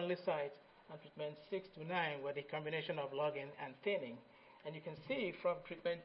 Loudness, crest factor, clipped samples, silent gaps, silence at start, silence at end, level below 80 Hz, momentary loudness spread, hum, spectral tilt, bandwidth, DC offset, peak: -43 LUFS; 20 dB; under 0.1%; none; 0 s; 0 s; -80 dBFS; 15 LU; none; -3.5 dB/octave; 5.6 kHz; under 0.1%; -24 dBFS